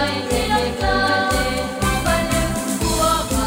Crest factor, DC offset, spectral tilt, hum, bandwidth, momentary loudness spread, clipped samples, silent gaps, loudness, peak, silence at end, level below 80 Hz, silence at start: 14 dB; under 0.1%; -4 dB/octave; none; 16.5 kHz; 4 LU; under 0.1%; none; -19 LUFS; -6 dBFS; 0 s; -28 dBFS; 0 s